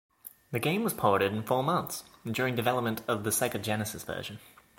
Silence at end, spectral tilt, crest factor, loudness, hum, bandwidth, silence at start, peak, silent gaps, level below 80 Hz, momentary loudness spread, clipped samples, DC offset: 0.4 s; -4.5 dB/octave; 22 dB; -30 LUFS; none; 17 kHz; 0.25 s; -10 dBFS; none; -64 dBFS; 12 LU; under 0.1%; under 0.1%